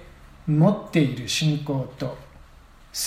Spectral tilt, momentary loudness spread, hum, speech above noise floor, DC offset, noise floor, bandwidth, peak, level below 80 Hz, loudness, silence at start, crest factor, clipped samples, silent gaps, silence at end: -5.5 dB/octave; 14 LU; none; 27 dB; under 0.1%; -49 dBFS; 16 kHz; -6 dBFS; -50 dBFS; -24 LUFS; 0 s; 18 dB; under 0.1%; none; 0 s